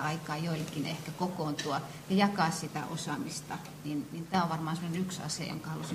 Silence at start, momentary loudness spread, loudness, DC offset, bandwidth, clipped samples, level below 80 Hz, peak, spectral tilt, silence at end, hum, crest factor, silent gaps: 0 s; 9 LU; -34 LUFS; under 0.1%; 15.5 kHz; under 0.1%; -66 dBFS; -14 dBFS; -5 dB/octave; 0 s; none; 20 dB; none